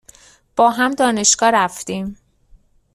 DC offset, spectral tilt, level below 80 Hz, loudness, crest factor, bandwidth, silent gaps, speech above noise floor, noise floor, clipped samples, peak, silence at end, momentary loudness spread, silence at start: under 0.1%; -2 dB/octave; -54 dBFS; -16 LUFS; 18 dB; 14.5 kHz; none; 34 dB; -51 dBFS; under 0.1%; 0 dBFS; 0.8 s; 14 LU; 0.55 s